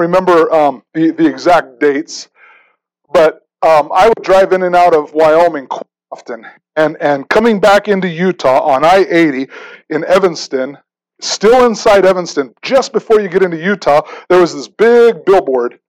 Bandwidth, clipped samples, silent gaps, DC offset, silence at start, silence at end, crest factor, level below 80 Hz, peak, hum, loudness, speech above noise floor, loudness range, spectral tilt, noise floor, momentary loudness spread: 15 kHz; under 0.1%; none; under 0.1%; 0 s; 0.2 s; 10 dB; -44 dBFS; -2 dBFS; none; -11 LUFS; 46 dB; 2 LU; -5 dB/octave; -56 dBFS; 13 LU